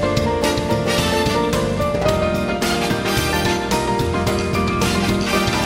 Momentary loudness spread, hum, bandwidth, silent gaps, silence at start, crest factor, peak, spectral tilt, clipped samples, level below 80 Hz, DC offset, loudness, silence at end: 2 LU; none; 16.5 kHz; none; 0 s; 14 dB; -4 dBFS; -4.5 dB/octave; under 0.1%; -32 dBFS; under 0.1%; -19 LUFS; 0 s